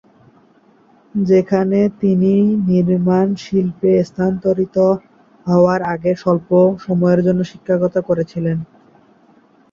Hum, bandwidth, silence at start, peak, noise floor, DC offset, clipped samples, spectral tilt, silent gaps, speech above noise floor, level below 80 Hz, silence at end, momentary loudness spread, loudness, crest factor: none; 7 kHz; 1.15 s; -2 dBFS; -51 dBFS; under 0.1%; under 0.1%; -9 dB/octave; none; 37 dB; -52 dBFS; 1.1 s; 7 LU; -16 LUFS; 14 dB